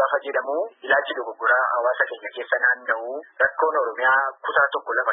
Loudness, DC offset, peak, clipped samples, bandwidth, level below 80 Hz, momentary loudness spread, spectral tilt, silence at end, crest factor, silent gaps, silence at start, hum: -22 LUFS; under 0.1%; -6 dBFS; under 0.1%; 3.9 kHz; -74 dBFS; 8 LU; -6.5 dB/octave; 0 s; 16 dB; none; 0 s; none